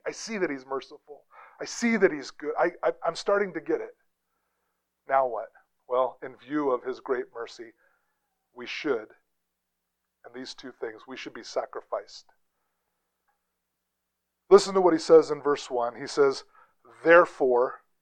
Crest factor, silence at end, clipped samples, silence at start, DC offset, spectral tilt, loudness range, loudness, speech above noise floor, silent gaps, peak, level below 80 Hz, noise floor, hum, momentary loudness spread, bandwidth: 24 dB; 0.25 s; under 0.1%; 0.05 s; under 0.1%; -4.5 dB/octave; 15 LU; -26 LUFS; 56 dB; none; -4 dBFS; -68 dBFS; -82 dBFS; none; 21 LU; 10 kHz